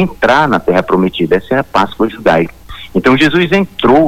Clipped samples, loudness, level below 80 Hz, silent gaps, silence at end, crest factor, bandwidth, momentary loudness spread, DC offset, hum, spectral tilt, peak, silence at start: under 0.1%; -12 LUFS; -38 dBFS; none; 0 s; 10 dB; 15.5 kHz; 5 LU; under 0.1%; none; -6.5 dB/octave; 0 dBFS; 0 s